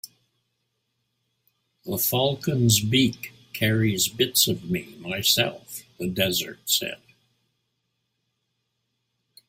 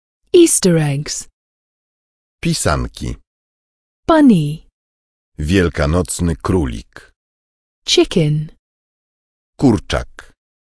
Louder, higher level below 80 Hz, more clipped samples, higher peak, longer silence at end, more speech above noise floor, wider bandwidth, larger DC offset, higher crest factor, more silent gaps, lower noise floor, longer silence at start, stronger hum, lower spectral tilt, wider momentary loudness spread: second, -23 LUFS vs -15 LUFS; second, -60 dBFS vs -32 dBFS; neither; second, -4 dBFS vs 0 dBFS; first, 2.55 s vs 0.7 s; second, 53 dB vs over 75 dB; first, 16.5 kHz vs 11 kHz; neither; first, 22 dB vs 16 dB; second, none vs 1.33-2.38 s, 3.27-4.03 s, 4.72-5.32 s, 7.16-7.82 s, 8.59-9.53 s; second, -77 dBFS vs under -90 dBFS; second, 0.05 s vs 0.35 s; neither; second, -3.5 dB/octave vs -5 dB/octave; about the same, 18 LU vs 17 LU